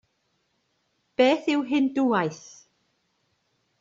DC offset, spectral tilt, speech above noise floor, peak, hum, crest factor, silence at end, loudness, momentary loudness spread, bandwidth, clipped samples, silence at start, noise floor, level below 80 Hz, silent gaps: under 0.1%; -5 dB/octave; 50 dB; -6 dBFS; none; 20 dB; 1.45 s; -23 LUFS; 12 LU; 7.6 kHz; under 0.1%; 1.2 s; -73 dBFS; -72 dBFS; none